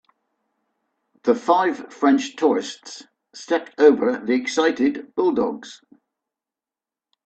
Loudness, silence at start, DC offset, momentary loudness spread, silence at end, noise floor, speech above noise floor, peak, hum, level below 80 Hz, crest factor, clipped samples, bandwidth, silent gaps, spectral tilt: -20 LUFS; 1.25 s; under 0.1%; 20 LU; 1.5 s; -90 dBFS; 69 dB; -2 dBFS; none; -66 dBFS; 20 dB; under 0.1%; 8.6 kHz; none; -4 dB/octave